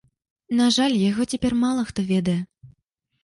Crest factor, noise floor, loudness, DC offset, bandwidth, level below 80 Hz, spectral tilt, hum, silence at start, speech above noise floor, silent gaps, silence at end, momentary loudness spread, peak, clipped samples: 14 dB; -72 dBFS; -22 LUFS; under 0.1%; 11.5 kHz; -50 dBFS; -5 dB/octave; none; 0.5 s; 51 dB; none; 0.55 s; 8 LU; -8 dBFS; under 0.1%